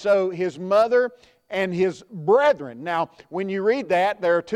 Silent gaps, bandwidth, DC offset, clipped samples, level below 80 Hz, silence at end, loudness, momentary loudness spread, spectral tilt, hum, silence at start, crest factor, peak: none; 11 kHz; under 0.1%; under 0.1%; -66 dBFS; 0 s; -22 LUFS; 10 LU; -6 dB/octave; none; 0 s; 14 dB; -6 dBFS